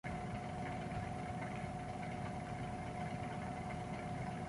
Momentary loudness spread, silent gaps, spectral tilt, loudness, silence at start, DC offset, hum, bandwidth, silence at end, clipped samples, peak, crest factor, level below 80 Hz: 1 LU; none; -6.5 dB/octave; -44 LUFS; 0.05 s; under 0.1%; none; 11.5 kHz; 0 s; under 0.1%; -30 dBFS; 14 dB; -56 dBFS